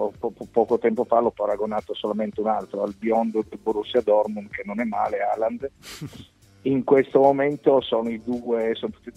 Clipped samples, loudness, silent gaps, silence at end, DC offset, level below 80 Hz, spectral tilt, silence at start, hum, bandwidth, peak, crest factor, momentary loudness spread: under 0.1%; -23 LUFS; none; 0.05 s; under 0.1%; -58 dBFS; -6.5 dB/octave; 0 s; none; 13.5 kHz; -4 dBFS; 20 dB; 12 LU